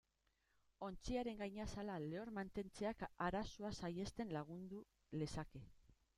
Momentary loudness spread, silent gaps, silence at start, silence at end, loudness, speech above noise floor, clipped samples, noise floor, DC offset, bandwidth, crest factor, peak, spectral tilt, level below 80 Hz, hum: 9 LU; none; 0.8 s; 0.25 s; -48 LUFS; 37 dB; under 0.1%; -84 dBFS; under 0.1%; 14 kHz; 20 dB; -28 dBFS; -6 dB/octave; -64 dBFS; none